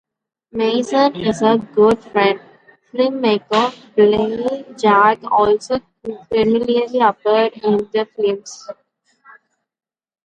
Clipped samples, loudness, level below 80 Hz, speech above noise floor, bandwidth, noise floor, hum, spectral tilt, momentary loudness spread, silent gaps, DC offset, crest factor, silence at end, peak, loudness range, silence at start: under 0.1%; -16 LUFS; -54 dBFS; 36 dB; 9.2 kHz; -52 dBFS; none; -5.5 dB/octave; 12 LU; none; under 0.1%; 16 dB; 1.5 s; 0 dBFS; 3 LU; 0.55 s